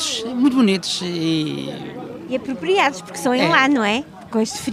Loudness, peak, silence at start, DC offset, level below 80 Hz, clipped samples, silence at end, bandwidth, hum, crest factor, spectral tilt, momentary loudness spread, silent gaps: -19 LUFS; 0 dBFS; 0 s; under 0.1%; -60 dBFS; under 0.1%; 0 s; 15.5 kHz; none; 20 dB; -4 dB/octave; 13 LU; none